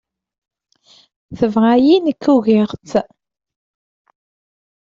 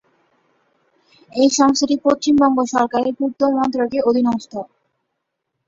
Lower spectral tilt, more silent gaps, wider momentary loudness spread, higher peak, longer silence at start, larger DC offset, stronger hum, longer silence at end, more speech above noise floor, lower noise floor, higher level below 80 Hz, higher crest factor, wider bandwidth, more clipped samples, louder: first, -7 dB/octave vs -3.5 dB/octave; neither; second, 9 LU vs 12 LU; about the same, -2 dBFS vs -2 dBFS; about the same, 1.3 s vs 1.35 s; neither; neither; first, 1.85 s vs 1 s; second, 38 dB vs 59 dB; second, -52 dBFS vs -76 dBFS; about the same, -56 dBFS vs -58 dBFS; about the same, 16 dB vs 16 dB; about the same, 7.6 kHz vs 7.8 kHz; neither; about the same, -15 LUFS vs -17 LUFS